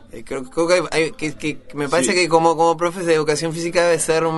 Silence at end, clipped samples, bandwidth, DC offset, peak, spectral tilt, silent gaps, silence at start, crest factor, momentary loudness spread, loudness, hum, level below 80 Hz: 0 s; under 0.1%; 12 kHz; under 0.1%; -2 dBFS; -4 dB/octave; none; 0.15 s; 18 dB; 11 LU; -18 LUFS; none; -48 dBFS